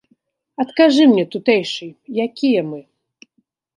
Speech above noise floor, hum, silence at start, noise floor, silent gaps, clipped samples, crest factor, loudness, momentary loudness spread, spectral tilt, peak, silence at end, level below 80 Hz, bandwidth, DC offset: 50 dB; none; 0.6 s; -66 dBFS; none; under 0.1%; 18 dB; -17 LUFS; 17 LU; -5.5 dB/octave; 0 dBFS; 0.95 s; -70 dBFS; 10.5 kHz; under 0.1%